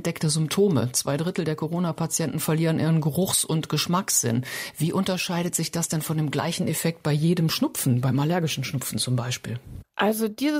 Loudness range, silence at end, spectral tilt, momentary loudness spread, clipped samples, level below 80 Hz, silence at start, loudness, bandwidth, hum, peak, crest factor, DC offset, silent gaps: 1 LU; 0 s; -4.5 dB/octave; 6 LU; under 0.1%; -60 dBFS; 0 s; -24 LUFS; 16 kHz; none; -8 dBFS; 16 dB; under 0.1%; none